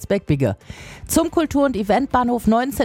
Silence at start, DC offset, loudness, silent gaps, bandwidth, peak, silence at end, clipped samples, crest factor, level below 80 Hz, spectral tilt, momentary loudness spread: 0 s; under 0.1%; -19 LUFS; none; 17 kHz; -4 dBFS; 0 s; under 0.1%; 16 dB; -40 dBFS; -5.5 dB/octave; 11 LU